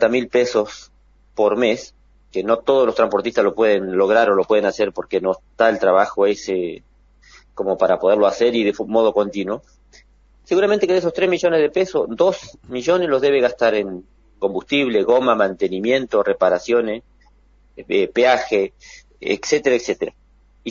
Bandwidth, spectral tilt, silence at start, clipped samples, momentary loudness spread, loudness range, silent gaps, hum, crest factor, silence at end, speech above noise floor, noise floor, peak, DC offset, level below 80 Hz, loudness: 7.4 kHz; -4.5 dB/octave; 0 s; under 0.1%; 11 LU; 3 LU; none; none; 18 dB; 0 s; 35 dB; -53 dBFS; 0 dBFS; under 0.1%; -54 dBFS; -18 LUFS